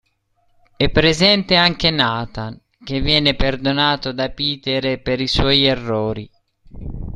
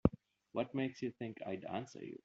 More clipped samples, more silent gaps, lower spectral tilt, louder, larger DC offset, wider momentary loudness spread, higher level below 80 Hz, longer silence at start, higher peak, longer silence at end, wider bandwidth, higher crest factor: neither; neither; second, -5 dB/octave vs -7 dB/octave; first, -17 LUFS vs -42 LUFS; neither; first, 17 LU vs 8 LU; first, -32 dBFS vs -58 dBFS; first, 0.8 s vs 0.05 s; first, 0 dBFS vs -12 dBFS; about the same, 0 s vs 0.1 s; first, 12 kHz vs 7.4 kHz; second, 18 dB vs 28 dB